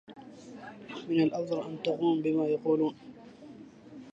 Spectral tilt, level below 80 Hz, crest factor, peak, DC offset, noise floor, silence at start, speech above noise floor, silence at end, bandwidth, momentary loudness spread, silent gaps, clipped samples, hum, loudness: -7.5 dB/octave; -76 dBFS; 16 dB; -16 dBFS; under 0.1%; -50 dBFS; 0.1 s; 21 dB; 0 s; 7.6 kHz; 22 LU; none; under 0.1%; none; -30 LUFS